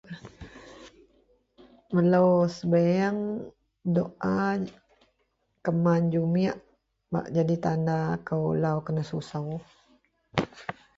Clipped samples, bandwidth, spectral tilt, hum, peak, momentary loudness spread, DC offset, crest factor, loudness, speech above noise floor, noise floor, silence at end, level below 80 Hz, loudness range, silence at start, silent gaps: under 0.1%; 7.6 kHz; -8.5 dB/octave; none; -4 dBFS; 17 LU; under 0.1%; 24 dB; -27 LUFS; 48 dB; -74 dBFS; 0.25 s; -60 dBFS; 4 LU; 0.1 s; none